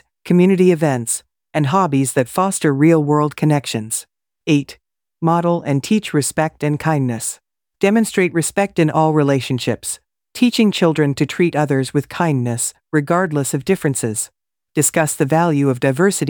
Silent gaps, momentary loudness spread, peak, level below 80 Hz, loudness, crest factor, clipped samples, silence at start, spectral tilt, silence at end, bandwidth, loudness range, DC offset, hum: none; 9 LU; -2 dBFS; -58 dBFS; -17 LUFS; 14 dB; under 0.1%; 0.25 s; -5.5 dB/octave; 0 s; 19.5 kHz; 3 LU; under 0.1%; none